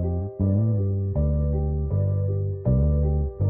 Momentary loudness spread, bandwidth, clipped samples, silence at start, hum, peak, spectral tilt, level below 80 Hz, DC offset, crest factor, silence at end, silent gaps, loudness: 4 LU; 1.9 kHz; under 0.1%; 0 s; none; -12 dBFS; -16 dB/octave; -28 dBFS; under 0.1%; 10 dB; 0 s; none; -24 LUFS